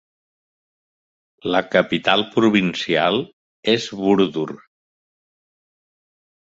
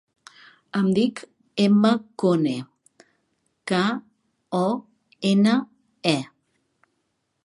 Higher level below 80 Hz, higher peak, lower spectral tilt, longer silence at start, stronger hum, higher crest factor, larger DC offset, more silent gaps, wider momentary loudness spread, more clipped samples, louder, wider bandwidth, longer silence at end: first, -60 dBFS vs -70 dBFS; about the same, -2 dBFS vs -4 dBFS; about the same, -5.5 dB/octave vs -6.5 dB/octave; first, 1.45 s vs 0.75 s; neither; about the same, 20 dB vs 20 dB; neither; first, 3.33-3.63 s vs none; about the same, 12 LU vs 14 LU; neither; first, -19 LUFS vs -23 LUFS; second, 7.8 kHz vs 11 kHz; first, 1.95 s vs 1.2 s